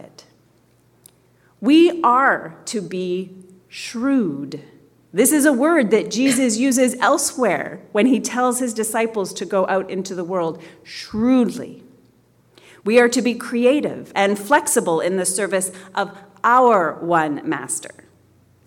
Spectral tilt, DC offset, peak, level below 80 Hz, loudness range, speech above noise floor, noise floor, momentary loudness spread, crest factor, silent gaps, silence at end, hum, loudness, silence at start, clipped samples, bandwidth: -3.5 dB/octave; under 0.1%; -2 dBFS; -64 dBFS; 5 LU; 38 dB; -57 dBFS; 14 LU; 16 dB; none; 0.8 s; none; -18 LUFS; 0 s; under 0.1%; 17.5 kHz